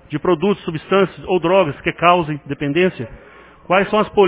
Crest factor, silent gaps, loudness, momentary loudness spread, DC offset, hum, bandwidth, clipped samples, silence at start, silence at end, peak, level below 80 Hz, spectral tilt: 18 dB; none; -17 LUFS; 9 LU; under 0.1%; none; 4 kHz; under 0.1%; 0.1 s; 0 s; 0 dBFS; -48 dBFS; -10 dB/octave